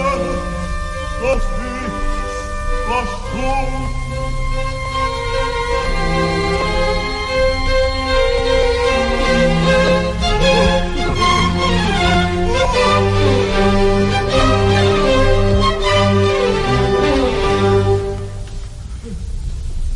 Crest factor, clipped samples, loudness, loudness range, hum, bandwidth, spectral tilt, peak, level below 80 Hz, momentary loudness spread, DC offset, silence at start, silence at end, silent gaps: 14 dB; under 0.1%; -16 LUFS; 7 LU; none; 11.5 kHz; -5.5 dB/octave; -2 dBFS; -22 dBFS; 11 LU; under 0.1%; 0 s; 0 s; none